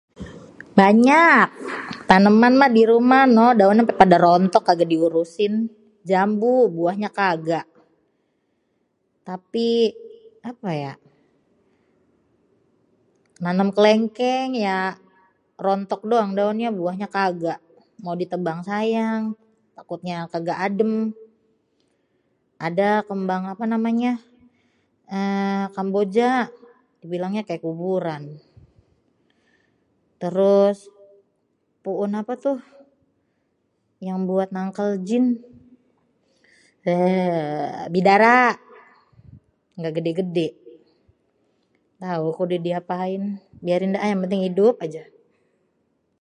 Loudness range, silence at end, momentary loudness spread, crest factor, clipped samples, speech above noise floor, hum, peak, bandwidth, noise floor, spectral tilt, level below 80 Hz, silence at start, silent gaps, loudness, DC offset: 13 LU; 1.2 s; 17 LU; 22 dB; under 0.1%; 51 dB; none; 0 dBFS; 10 kHz; -70 dBFS; -7 dB/octave; -62 dBFS; 0.2 s; none; -20 LUFS; under 0.1%